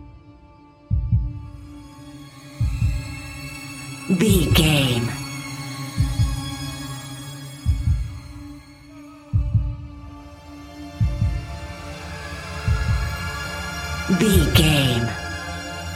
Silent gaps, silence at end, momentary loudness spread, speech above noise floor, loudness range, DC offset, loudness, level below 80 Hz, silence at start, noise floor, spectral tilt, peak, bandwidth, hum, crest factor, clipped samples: none; 0 s; 24 LU; 31 dB; 8 LU; under 0.1%; -23 LUFS; -30 dBFS; 0 s; -48 dBFS; -5 dB/octave; -2 dBFS; 16.5 kHz; none; 22 dB; under 0.1%